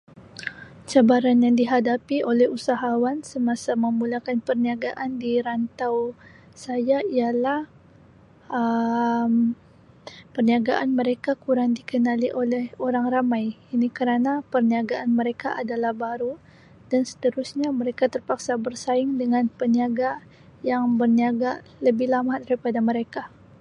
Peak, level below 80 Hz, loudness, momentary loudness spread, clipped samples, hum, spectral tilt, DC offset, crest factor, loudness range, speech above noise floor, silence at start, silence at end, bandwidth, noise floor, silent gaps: -4 dBFS; -64 dBFS; -23 LUFS; 10 LU; under 0.1%; none; -6 dB/octave; under 0.1%; 18 dB; 5 LU; 29 dB; 0.15 s; 0.35 s; 10.5 kHz; -52 dBFS; none